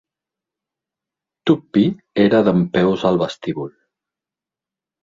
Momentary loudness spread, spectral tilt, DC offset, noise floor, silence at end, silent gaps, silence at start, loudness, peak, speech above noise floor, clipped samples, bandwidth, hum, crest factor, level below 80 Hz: 12 LU; -8 dB/octave; under 0.1%; -88 dBFS; 1.35 s; none; 1.45 s; -18 LUFS; -2 dBFS; 72 dB; under 0.1%; 7.6 kHz; none; 18 dB; -54 dBFS